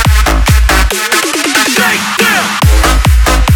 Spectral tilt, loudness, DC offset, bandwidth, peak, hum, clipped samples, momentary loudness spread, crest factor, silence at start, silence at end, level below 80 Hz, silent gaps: -3.5 dB/octave; -9 LUFS; under 0.1%; 18 kHz; 0 dBFS; none; under 0.1%; 2 LU; 8 dB; 0 s; 0 s; -12 dBFS; none